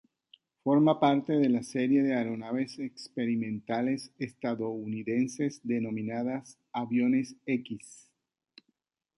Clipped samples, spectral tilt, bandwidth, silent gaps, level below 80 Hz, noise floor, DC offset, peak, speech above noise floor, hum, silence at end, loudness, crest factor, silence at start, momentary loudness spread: under 0.1%; -6.5 dB/octave; 11.5 kHz; none; -74 dBFS; -79 dBFS; under 0.1%; -10 dBFS; 50 dB; none; 1.3 s; -30 LUFS; 20 dB; 0.65 s; 12 LU